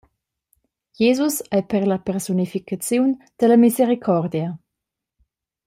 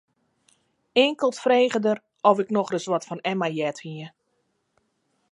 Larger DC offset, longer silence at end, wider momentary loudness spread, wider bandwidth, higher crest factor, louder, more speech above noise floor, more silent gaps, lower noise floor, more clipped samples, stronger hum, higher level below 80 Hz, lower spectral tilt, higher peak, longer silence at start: neither; second, 1.1 s vs 1.25 s; about the same, 11 LU vs 13 LU; first, 16 kHz vs 11 kHz; second, 16 dB vs 22 dB; first, -20 LUFS vs -23 LUFS; first, 64 dB vs 50 dB; neither; first, -83 dBFS vs -73 dBFS; neither; neither; first, -62 dBFS vs -80 dBFS; about the same, -6 dB/octave vs -5 dB/octave; about the same, -4 dBFS vs -4 dBFS; about the same, 1 s vs 0.95 s